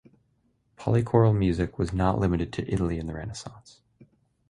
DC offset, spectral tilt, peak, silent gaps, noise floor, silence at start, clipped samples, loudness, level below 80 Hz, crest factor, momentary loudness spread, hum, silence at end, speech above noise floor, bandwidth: under 0.1%; -8 dB/octave; -6 dBFS; none; -69 dBFS; 0.8 s; under 0.1%; -26 LUFS; -42 dBFS; 22 dB; 15 LU; none; 0.45 s; 44 dB; 10.5 kHz